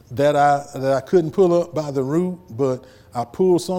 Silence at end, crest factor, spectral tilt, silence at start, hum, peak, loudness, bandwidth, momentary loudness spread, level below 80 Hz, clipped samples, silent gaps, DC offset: 0 s; 14 dB; -7 dB/octave; 0.1 s; none; -6 dBFS; -20 LUFS; 16 kHz; 12 LU; -56 dBFS; under 0.1%; none; under 0.1%